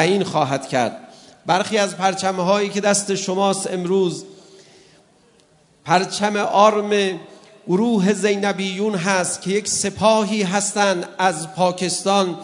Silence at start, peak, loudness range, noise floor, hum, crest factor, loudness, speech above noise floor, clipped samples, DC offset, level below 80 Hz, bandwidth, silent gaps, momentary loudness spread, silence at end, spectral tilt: 0 s; 0 dBFS; 4 LU; -55 dBFS; none; 20 dB; -19 LUFS; 36 dB; under 0.1%; under 0.1%; -66 dBFS; 11 kHz; none; 6 LU; 0 s; -4 dB/octave